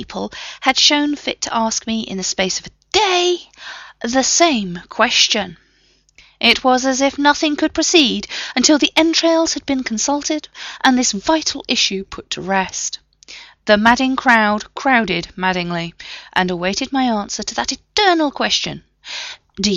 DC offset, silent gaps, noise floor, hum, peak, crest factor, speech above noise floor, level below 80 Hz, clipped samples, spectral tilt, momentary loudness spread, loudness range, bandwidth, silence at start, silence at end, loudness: under 0.1%; none; -57 dBFS; none; 0 dBFS; 18 dB; 39 dB; -48 dBFS; under 0.1%; -2.5 dB/octave; 15 LU; 4 LU; 13 kHz; 0 s; 0 s; -16 LUFS